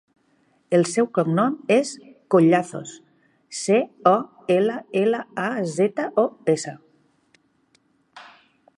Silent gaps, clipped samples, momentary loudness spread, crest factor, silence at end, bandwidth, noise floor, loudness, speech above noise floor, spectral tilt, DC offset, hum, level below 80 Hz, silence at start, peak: none; under 0.1%; 13 LU; 20 dB; 0.55 s; 11.5 kHz; -64 dBFS; -21 LUFS; 43 dB; -5.5 dB/octave; under 0.1%; none; -76 dBFS; 0.7 s; -2 dBFS